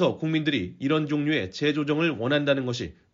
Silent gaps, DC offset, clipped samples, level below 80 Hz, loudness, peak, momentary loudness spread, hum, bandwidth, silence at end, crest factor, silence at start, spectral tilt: none; under 0.1%; under 0.1%; -60 dBFS; -25 LUFS; -10 dBFS; 4 LU; none; 7.4 kHz; 0.2 s; 16 dB; 0 s; -4.5 dB/octave